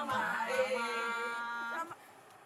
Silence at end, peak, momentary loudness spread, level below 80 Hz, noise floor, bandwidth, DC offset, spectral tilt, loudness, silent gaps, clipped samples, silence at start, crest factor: 0 s; -20 dBFS; 9 LU; -86 dBFS; -57 dBFS; 14.5 kHz; under 0.1%; -3 dB/octave; -35 LUFS; none; under 0.1%; 0 s; 16 dB